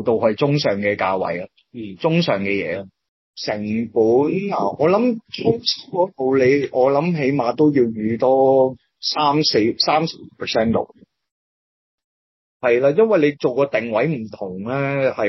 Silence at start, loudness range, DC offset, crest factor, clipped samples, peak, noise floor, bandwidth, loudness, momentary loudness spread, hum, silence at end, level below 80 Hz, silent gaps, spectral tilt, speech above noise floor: 0 s; 5 LU; under 0.1%; 14 dB; under 0.1%; -4 dBFS; under -90 dBFS; 6.2 kHz; -19 LUFS; 10 LU; none; 0 s; -62 dBFS; 3.09-3.34 s, 11.31-11.98 s, 12.04-12.60 s; -6 dB/octave; over 72 dB